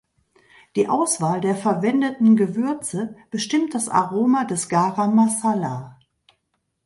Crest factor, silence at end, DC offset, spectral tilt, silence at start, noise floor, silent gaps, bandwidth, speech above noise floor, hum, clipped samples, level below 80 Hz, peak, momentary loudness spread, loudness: 16 dB; 0.95 s; under 0.1%; -5 dB/octave; 0.75 s; -73 dBFS; none; 11.5 kHz; 53 dB; none; under 0.1%; -66 dBFS; -4 dBFS; 11 LU; -21 LUFS